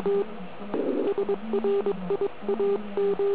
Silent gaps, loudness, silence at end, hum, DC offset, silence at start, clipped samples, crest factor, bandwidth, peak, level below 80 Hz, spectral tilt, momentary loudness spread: none; -28 LUFS; 0 s; none; 1%; 0 s; under 0.1%; 12 dB; 4 kHz; -14 dBFS; -62 dBFS; -11 dB/octave; 5 LU